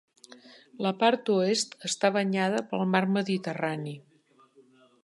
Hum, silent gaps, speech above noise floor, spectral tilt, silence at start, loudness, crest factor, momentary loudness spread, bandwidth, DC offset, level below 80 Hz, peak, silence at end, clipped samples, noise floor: none; none; 34 dB; -4.5 dB/octave; 0.3 s; -27 LUFS; 20 dB; 7 LU; 11.5 kHz; under 0.1%; -80 dBFS; -8 dBFS; 1.05 s; under 0.1%; -61 dBFS